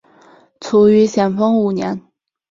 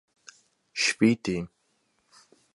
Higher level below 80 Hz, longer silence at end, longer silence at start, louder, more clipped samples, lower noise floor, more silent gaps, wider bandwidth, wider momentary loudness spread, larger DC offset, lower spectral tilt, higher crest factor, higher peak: about the same, -58 dBFS vs -62 dBFS; second, 0.5 s vs 1.1 s; second, 0.6 s vs 0.75 s; first, -14 LUFS vs -26 LUFS; neither; second, -48 dBFS vs -72 dBFS; neither; second, 7.6 kHz vs 11.5 kHz; about the same, 15 LU vs 15 LU; neither; first, -7 dB/octave vs -4 dB/octave; second, 14 dB vs 22 dB; first, -2 dBFS vs -8 dBFS